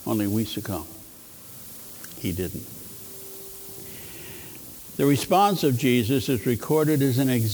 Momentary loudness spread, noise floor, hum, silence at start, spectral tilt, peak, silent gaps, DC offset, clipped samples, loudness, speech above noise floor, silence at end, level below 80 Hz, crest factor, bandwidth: 18 LU; -45 dBFS; none; 0 s; -5.5 dB/octave; -8 dBFS; none; under 0.1%; under 0.1%; -23 LUFS; 22 dB; 0 s; -56 dBFS; 18 dB; over 20 kHz